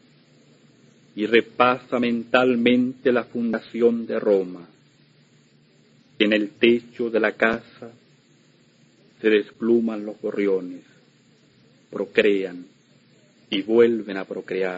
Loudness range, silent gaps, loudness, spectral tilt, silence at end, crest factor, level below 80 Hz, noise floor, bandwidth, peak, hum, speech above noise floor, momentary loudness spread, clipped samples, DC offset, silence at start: 5 LU; none; -22 LUFS; -6.5 dB/octave; 0 s; 20 dB; -68 dBFS; -57 dBFS; 7.8 kHz; -2 dBFS; none; 36 dB; 14 LU; under 0.1%; under 0.1%; 1.15 s